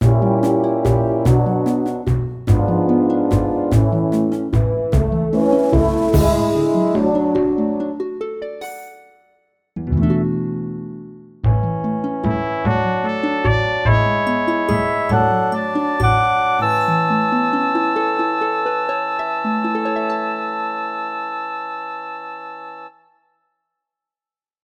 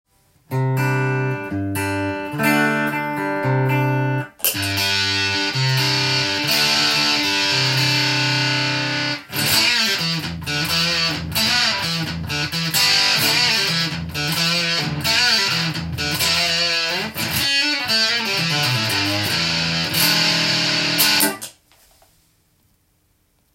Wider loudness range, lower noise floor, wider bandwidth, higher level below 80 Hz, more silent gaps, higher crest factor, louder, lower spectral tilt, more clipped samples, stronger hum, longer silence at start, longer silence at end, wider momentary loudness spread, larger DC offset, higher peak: first, 7 LU vs 4 LU; first, under -90 dBFS vs -63 dBFS; about the same, 15.5 kHz vs 17 kHz; first, -30 dBFS vs -52 dBFS; neither; about the same, 16 dB vs 20 dB; about the same, -18 LUFS vs -17 LUFS; first, -8 dB/octave vs -3 dB/octave; neither; neither; second, 0 s vs 0.5 s; second, 1.75 s vs 2.05 s; first, 12 LU vs 8 LU; neither; about the same, -2 dBFS vs 0 dBFS